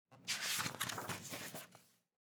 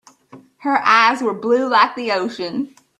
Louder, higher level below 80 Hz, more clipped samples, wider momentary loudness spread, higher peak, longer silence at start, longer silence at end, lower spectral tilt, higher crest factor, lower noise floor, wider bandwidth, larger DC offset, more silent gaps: second, -41 LUFS vs -17 LUFS; second, -84 dBFS vs -68 dBFS; neither; about the same, 12 LU vs 12 LU; second, -24 dBFS vs 0 dBFS; second, 0.1 s vs 0.35 s; about the same, 0.4 s vs 0.35 s; second, -1.5 dB/octave vs -3.5 dB/octave; about the same, 22 dB vs 18 dB; first, -67 dBFS vs -45 dBFS; first, over 20 kHz vs 12 kHz; neither; neither